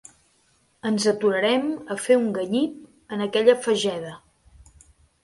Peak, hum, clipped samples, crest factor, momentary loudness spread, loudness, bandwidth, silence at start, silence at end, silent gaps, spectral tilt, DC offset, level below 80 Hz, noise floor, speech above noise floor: -4 dBFS; none; under 0.1%; 20 dB; 12 LU; -23 LUFS; 11.5 kHz; 0.85 s; 1.05 s; none; -4 dB/octave; under 0.1%; -62 dBFS; -64 dBFS; 42 dB